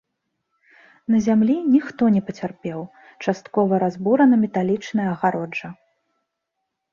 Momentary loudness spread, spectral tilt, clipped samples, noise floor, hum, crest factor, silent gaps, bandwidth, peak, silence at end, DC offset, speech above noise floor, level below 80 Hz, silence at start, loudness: 14 LU; -7.5 dB/octave; under 0.1%; -79 dBFS; none; 16 dB; none; 7.2 kHz; -4 dBFS; 1.2 s; under 0.1%; 59 dB; -62 dBFS; 1.1 s; -20 LUFS